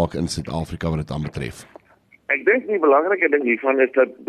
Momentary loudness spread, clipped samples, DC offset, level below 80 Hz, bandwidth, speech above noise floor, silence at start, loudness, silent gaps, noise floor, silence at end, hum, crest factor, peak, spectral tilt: 12 LU; under 0.1%; under 0.1%; -44 dBFS; 13 kHz; 35 dB; 0 s; -20 LUFS; none; -55 dBFS; 0.05 s; none; 16 dB; -4 dBFS; -6 dB/octave